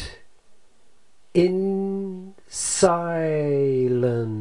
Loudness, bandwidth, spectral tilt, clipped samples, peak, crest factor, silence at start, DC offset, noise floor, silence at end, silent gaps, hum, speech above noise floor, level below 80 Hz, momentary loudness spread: -22 LUFS; 11.5 kHz; -5.5 dB/octave; under 0.1%; -4 dBFS; 20 dB; 0 s; 0.5%; -62 dBFS; 0 s; none; none; 41 dB; -54 dBFS; 14 LU